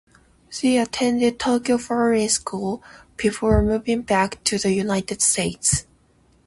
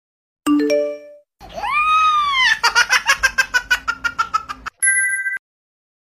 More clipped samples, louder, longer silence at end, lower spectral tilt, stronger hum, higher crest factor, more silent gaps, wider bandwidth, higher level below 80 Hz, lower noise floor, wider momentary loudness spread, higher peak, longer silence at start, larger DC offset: neither; second, -21 LUFS vs -16 LUFS; about the same, 0.65 s vs 0.7 s; first, -4 dB/octave vs -0.5 dB/octave; neither; about the same, 18 dB vs 18 dB; neither; second, 11.5 kHz vs 16 kHz; first, -38 dBFS vs -48 dBFS; first, -58 dBFS vs -42 dBFS; second, 7 LU vs 12 LU; second, -4 dBFS vs 0 dBFS; about the same, 0.5 s vs 0.45 s; neither